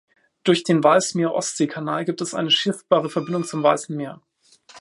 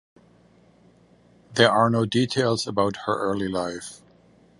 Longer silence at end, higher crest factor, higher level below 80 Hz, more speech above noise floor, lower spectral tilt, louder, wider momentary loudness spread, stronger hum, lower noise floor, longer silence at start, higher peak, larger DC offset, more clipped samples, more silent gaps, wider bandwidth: second, 0 s vs 0.65 s; about the same, 20 dB vs 24 dB; second, -72 dBFS vs -58 dBFS; about the same, 32 dB vs 34 dB; about the same, -4 dB/octave vs -5 dB/octave; about the same, -21 LUFS vs -23 LUFS; second, 9 LU vs 13 LU; neither; second, -52 dBFS vs -56 dBFS; second, 0.45 s vs 1.5 s; about the same, -2 dBFS vs -2 dBFS; neither; neither; neither; about the same, 11.5 kHz vs 11.5 kHz